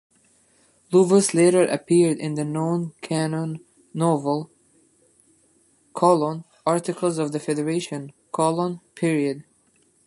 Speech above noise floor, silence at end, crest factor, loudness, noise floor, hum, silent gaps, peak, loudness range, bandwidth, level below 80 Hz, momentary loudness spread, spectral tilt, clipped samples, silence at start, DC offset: 41 dB; 0.65 s; 20 dB; -22 LUFS; -62 dBFS; none; none; -4 dBFS; 6 LU; 11.5 kHz; -70 dBFS; 15 LU; -6 dB/octave; under 0.1%; 0.9 s; under 0.1%